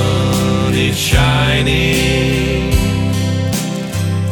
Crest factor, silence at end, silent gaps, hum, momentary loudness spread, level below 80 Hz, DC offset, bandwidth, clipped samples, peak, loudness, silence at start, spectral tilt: 14 dB; 0 s; none; none; 6 LU; -24 dBFS; under 0.1%; 19.5 kHz; under 0.1%; 0 dBFS; -14 LUFS; 0 s; -5 dB/octave